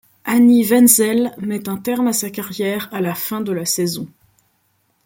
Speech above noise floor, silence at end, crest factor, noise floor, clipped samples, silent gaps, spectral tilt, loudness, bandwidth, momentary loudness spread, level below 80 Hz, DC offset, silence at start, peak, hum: 47 dB; 1 s; 18 dB; -64 dBFS; under 0.1%; none; -4 dB/octave; -17 LUFS; 17 kHz; 12 LU; -62 dBFS; under 0.1%; 0.25 s; 0 dBFS; none